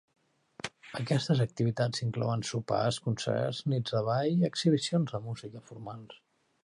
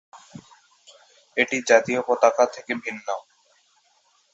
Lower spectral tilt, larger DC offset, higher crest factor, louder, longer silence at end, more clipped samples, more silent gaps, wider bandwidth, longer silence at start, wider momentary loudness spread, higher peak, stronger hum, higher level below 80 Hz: first, -6 dB/octave vs -3 dB/octave; neither; second, 16 dB vs 22 dB; second, -31 LUFS vs -22 LUFS; second, 0.5 s vs 1.15 s; neither; neither; first, 11.5 kHz vs 8 kHz; first, 0.65 s vs 0.15 s; about the same, 15 LU vs 13 LU; second, -14 dBFS vs -2 dBFS; neither; first, -66 dBFS vs -72 dBFS